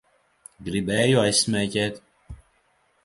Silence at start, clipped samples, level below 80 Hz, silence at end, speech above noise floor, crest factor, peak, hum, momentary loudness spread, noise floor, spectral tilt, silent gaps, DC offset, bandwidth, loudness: 0.6 s; under 0.1%; -52 dBFS; 0.7 s; 43 dB; 20 dB; -6 dBFS; none; 14 LU; -65 dBFS; -4 dB/octave; none; under 0.1%; 11.5 kHz; -22 LUFS